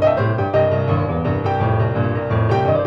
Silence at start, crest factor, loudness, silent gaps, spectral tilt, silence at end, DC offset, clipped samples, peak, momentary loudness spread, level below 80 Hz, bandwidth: 0 s; 12 dB; -18 LUFS; none; -9.5 dB/octave; 0 s; under 0.1%; under 0.1%; -6 dBFS; 3 LU; -38 dBFS; 6 kHz